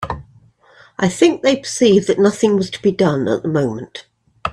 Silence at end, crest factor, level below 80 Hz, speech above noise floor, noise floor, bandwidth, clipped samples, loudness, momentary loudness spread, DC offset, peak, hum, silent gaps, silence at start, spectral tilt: 0 s; 16 dB; -48 dBFS; 34 dB; -49 dBFS; 12 kHz; under 0.1%; -16 LUFS; 17 LU; under 0.1%; -2 dBFS; none; none; 0 s; -5.5 dB/octave